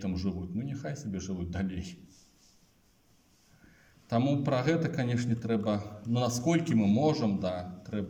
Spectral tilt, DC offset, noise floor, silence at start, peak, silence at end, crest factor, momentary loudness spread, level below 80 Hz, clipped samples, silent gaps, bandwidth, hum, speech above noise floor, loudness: -6.5 dB/octave; under 0.1%; -66 dBFS; 0 s; -14 dBFS; 0 s; 18 dB; 10 LU; -60 dBFS; under 0.1%; none; 16.5 kHz; none; 36 dB; -31 LUFS